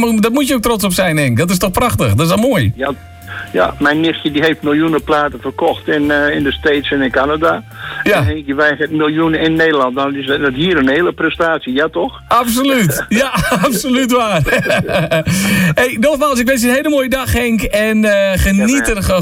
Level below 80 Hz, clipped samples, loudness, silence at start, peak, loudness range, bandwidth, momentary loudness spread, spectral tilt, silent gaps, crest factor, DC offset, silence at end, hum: -32 dBFS; under 0.1%; -13 LUFS; 0 s; 0 dBFS; 2 LU; 16.5 kHz; 4 LU; -5 dB/octave; none; 12 dB; under 0.1%; 0 s; none